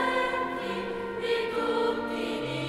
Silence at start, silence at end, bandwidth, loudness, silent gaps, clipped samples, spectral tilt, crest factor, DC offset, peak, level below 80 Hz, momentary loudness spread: 0 s; 0 s; 13.5 kHz; -29 LUFS; none; under 0.1%; -5 dB/octave; 14 dB; under 0.1%; -16 dBFS; -58 dBFS; 5 LU